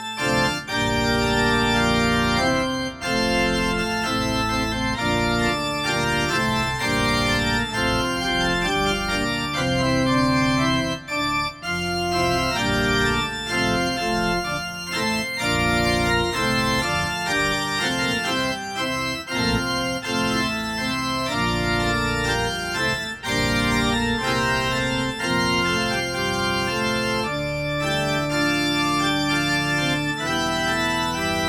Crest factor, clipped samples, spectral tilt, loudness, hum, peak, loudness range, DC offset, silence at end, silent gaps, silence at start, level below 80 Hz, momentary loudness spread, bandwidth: 14 dB; under 0.1%; -4 dB/octave; -22 LUFS; none; -8 dBFS; 2 LU; under 0.1%; 0 s; none; 0 s; -38 dBFS; 4 LU; 18 kHz